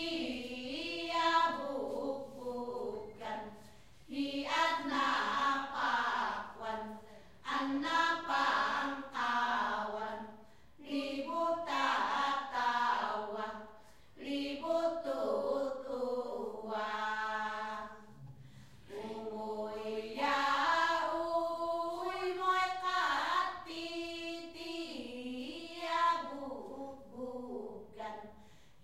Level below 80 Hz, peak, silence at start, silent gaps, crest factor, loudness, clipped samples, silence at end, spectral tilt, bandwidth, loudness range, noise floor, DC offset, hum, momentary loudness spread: -68 dBFS; -18 dBFS; 0 s; none; 18 dB; -36 LUFS; under 0.1%; 0.4 s; -3 dB/octave; 15.5 kHz; 5 LU; -61 dBFS; 0.1%; none; 14 LU